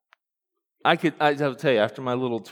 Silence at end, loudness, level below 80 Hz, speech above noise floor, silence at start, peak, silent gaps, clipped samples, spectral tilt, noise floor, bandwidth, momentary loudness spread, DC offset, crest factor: 0 s; -23 LUFS; -80 dBFS; 61 dB; 0.85 s; -4 dBFS; none; under 0.1%; -6 dB/octave; -84 dBFS; 18 kHz; 5 LU; under 0.1%; 22 dB